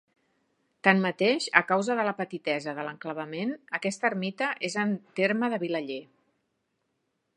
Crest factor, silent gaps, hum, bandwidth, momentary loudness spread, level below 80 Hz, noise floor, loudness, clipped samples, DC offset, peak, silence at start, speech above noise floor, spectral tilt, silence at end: 28 dB; none; none; 10.5 kHz; 12 LU; -82 dBFS; -78 dBFS; -28 LUFS; under 0.1%; under 0.1%; -2 dBFS; 0.85 s; 50 dB; -5 dB/octave; 1.35 s